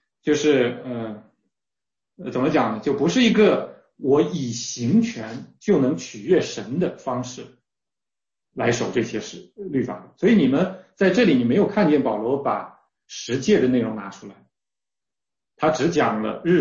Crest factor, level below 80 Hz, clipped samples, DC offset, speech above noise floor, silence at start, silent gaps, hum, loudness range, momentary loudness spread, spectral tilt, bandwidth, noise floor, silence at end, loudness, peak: 16 dB; -60 dBFS; under 0.1%; under 0.1%; over 69 dB; 0.25 s; none; none; 6 LU; 17 LU; -5.5 dB/octave; 7.6 kHz; under -90 dBFS; 0 s; -21 LUFS; -6 dBFS